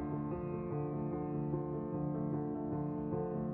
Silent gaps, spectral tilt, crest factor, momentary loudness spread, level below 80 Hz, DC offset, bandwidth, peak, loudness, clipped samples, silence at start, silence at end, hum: none; -12 dB/octave; 12 dB; 2 LU; -58 dBFS; under 0.1%; 2.9 kHz; -24 dBFS; -39 LUFS; under 0.1%; 0 s; 0 s; none